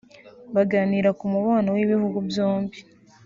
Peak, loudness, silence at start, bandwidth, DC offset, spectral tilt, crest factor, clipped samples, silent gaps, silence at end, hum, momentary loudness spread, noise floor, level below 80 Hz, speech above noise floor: -8 dBFS; -23 LUFS; 0.25 s; 7.4 kHz; under 0.1%; -6.5 dB/octave; 16 dB; under 0.1%; none; 0.45 s; none; 5 LU; -46 dBFS; -62 dBFS; 25 dB